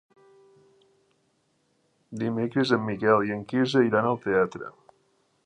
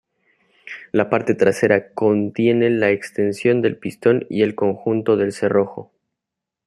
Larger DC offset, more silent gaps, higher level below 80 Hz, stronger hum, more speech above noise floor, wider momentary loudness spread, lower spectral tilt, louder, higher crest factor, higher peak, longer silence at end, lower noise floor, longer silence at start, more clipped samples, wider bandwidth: neither; neither; about the same, -66 dBFS vs -62 dBFS; neither; second, 46 dB vs 66 dB; first, 12 LU vs 6 LU; about the same, -6.5 dB/octave vs -7 dB/octave; second, -25 LUFS vs -19 LUFS; about the same, 22 dB vs 18 dB; second, -6 dBFS vs 0 dBFS; about the same, 0.75 s vs 0.85 s; second, -70 dBFS vs -84 dBFS; first, 2.1 s vs 0.65 s; neither; second, 9.8 kHz vs 12.5 kHz